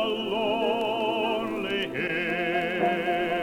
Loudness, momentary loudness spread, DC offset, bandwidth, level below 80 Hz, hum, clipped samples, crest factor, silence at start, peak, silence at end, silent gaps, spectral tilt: -27 LUFS; 3 LU; under 0.1%; 17.5 kHz; -60 dBFS; none; under 0.1%; 14 dB; 0 s; -14 dBFS; 0 s; none; -5.5 dB/octave